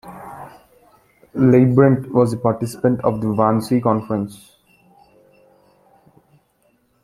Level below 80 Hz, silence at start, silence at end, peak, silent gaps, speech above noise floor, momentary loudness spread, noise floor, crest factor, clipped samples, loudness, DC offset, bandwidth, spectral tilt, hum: -54 dBFS; 0.05 s; 2.7 s; -2 dBFS; none; 46 dB; 20 LU; -62 dBFS; 18 dB; under 0.1%; -17 LUFS; under 0.1%; 13.5 kHz; -8.5 dB/octave; none